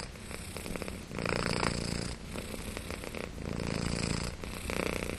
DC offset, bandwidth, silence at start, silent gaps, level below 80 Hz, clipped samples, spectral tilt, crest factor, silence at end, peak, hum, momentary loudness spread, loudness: under 0.1%; 14.5 kHz; 0 s; none; -46 dBFS; under 0.1%; -4.5 dB/octave; 26 dB; 0 s; -10 dBFS; none; 9 LU; -36 LUFS